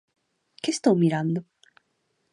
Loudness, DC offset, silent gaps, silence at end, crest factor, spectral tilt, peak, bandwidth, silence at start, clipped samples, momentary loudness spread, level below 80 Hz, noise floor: -24 LUFS; under 0.1%; none; 0.9 s; 20 dB; -6 dB/octave; -6 dBFS; 11.5 kHz; 0.65 s; under 0.1%; 11 LU; -74 dBFS; -73 dBFS